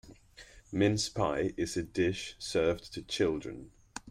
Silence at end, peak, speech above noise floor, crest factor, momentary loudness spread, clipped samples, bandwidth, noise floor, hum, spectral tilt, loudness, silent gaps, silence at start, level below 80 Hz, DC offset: 0 s; -16 dBFS; 24 dB; 18 dB; 14 LU; under 0.1%; 15.5 kHz; -55 dBFS; none; -5 dB/octave; -32 LUFS; none; 0.05 s; -56 dBFS; under 0.1%